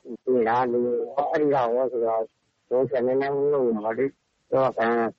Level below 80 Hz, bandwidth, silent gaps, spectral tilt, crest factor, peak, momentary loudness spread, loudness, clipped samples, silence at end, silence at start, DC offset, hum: -66 dBFS; 6.6 kHz; none; -8.5 dB/octave; 14 dB; -10 dBFS; 5 LU; -24 LUFS; under 0.1%; 0.05 s; 0.05 s; under 0.1%; none